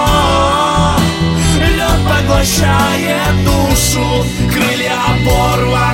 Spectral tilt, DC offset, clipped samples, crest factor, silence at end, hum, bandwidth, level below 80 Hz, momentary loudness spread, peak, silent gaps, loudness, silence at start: -4.5 dB/octave; under 0.1%; under 0.1%; 12 dB; 0 s; none; 17 kHz; -20 dBFS; 2 LU; 0 dBFS; none; -12 LUFS; 0 s